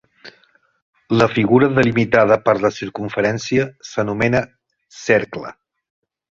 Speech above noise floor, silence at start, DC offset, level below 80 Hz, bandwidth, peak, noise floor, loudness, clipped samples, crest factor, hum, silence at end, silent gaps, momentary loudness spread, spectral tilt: 40 dB; 0.25 s; under 0.1%; -50 dBFS; 7.8 kHz; 0 dBFS; -57 dBFS; -17 LUFS; under 0.1%; 18 dB; none; 0.9 s; 0.82-0.93 s; 14 LU; -6.5 dB/octave